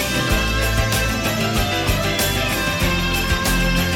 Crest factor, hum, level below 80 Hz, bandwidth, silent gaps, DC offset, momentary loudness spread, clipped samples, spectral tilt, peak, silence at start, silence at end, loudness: 12 dB; none; -26 dBFS; 19.5 kHz; none; under 0.1%; 1 LU; under 0.1%; -3.5 dB/octave; -6 dBFS; 0 s; 0 s; -19 LUFS